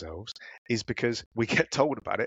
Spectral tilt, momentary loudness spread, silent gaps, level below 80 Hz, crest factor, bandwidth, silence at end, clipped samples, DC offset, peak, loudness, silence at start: -4.5 dB/octave; 15 LU; 0.58-0.65 s, 1.26-1.31 s; -56 dBFS; 22 dB; 8.8 kHz; 0 s; under 0.1%; under 0.1%; -8 dBFS; -28 LUFS; 0 s